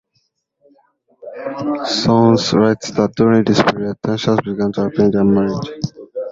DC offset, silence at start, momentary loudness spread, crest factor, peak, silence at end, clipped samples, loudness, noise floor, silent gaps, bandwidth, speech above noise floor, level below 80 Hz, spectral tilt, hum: under 0.1%; 1.25 s; 14 LU; 16 dB; 0 dBFS; 0 s; under 0.1%; -16 LUFS; -66 dBFS; none; 7.8 kHz; 51 dB; -48 dBFS; -6 dB/octave; none